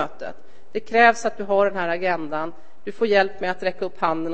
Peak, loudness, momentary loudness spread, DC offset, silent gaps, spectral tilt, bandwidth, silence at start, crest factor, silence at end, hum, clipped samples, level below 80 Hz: -2 dBFS; -21 LUFS; 18 LU; 3%; none; -4.5 dB/octave; 8.8 kHz; 0 s; 20 dB; 0 s; none; under 0.1%; -58 dBFS